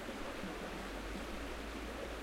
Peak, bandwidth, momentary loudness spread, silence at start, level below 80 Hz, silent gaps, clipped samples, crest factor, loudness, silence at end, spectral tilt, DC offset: -32 dBFS; 16 kHz; 1 LU; 0 s; -50 dBFS; none; under 0.1%; 12 dB; -44 LUFS; 0 s; -4.5 dB/octave; under 0.1%